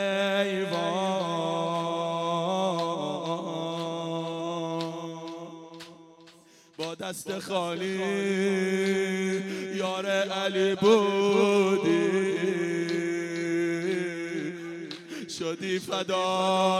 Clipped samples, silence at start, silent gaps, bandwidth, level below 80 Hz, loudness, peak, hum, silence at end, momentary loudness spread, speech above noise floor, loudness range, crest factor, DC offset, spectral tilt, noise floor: under 0.1%; 0 s; none; 14 kHz; -76 dBFS; -28 LUFS; -8 dBFS; none; 0 s; 14 LU; 30 dB; 10 LU; 20 dB; under 0.1%; -5 dB/octave; -56 dBFS